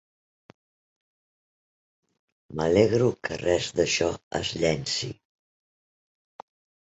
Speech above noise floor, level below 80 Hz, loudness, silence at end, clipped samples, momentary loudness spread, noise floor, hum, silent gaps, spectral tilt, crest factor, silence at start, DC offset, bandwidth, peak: over 65 dB; -52 dBFS; -25 LUFS; 1.75 s; under 0.1%; 10 LU; under -90 dBFS; none; 4.23-4.31 s; -4.5 dB/octave; 24 dB; 2.5 s; under 0.1%; 8.2 kHz; -4 dBFS